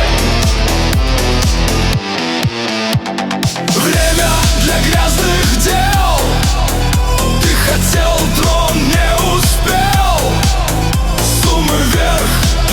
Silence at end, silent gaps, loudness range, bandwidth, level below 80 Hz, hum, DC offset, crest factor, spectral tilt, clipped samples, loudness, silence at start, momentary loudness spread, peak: 0 s; none; 2 LU; over 20 kHz; -16 dBFS; none; under 0.1%; 12 dB; -4 dB/octave; under 0.1%; -13 LUFS; 0 s; 4 LU; 0 dBFS